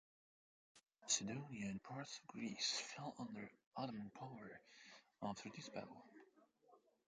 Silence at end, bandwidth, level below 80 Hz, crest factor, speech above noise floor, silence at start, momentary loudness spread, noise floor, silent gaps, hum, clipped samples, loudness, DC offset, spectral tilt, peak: 0.3 s; 9.4 kHz; -84 dBFS; 24 dB; 25 dB; 0.75 s; 20 LU; -74 dBFS; 3.66-3.72 s; none; under 0.1%; -47 LUFS; under 0.1%; -2.5 dB/octave; -26 dBFS